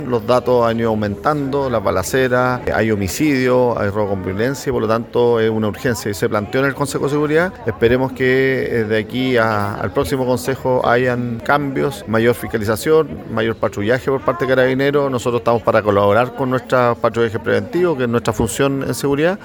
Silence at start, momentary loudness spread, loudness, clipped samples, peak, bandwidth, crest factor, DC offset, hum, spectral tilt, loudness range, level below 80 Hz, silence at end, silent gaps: 0 s; 5 LU; -17 LUFS; under 0.1%; 0 dBFS; 19 kHz; 16 dB; under 0.1%; none; -6 dB/octave; 2 LU; -42 dBFS; 0 s; none